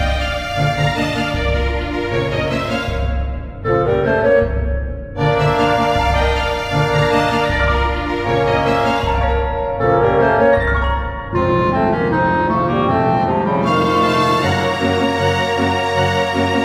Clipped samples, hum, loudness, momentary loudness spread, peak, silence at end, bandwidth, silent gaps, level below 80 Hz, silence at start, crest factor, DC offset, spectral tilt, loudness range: under 0.1%; none; -16 LUFS; 6 LU; 0 dBFS; 0 s; 15 kHz; none; -26 dBFS; 0 s; 16 dB; under 0.1%; -6 dB/octave; 3 LU